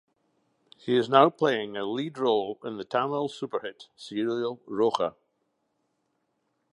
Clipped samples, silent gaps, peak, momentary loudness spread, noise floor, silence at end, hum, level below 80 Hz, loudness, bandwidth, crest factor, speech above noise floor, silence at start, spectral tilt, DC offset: under 0.1%; none; -4 dBFS; 14 LU; -76 dBFS; 1.65 s; none; -76 dBFS; -27 LUFS; 11 kHz; 24 dB; 49 dB; 0.85 s; -6 dB/octave; under 0.1%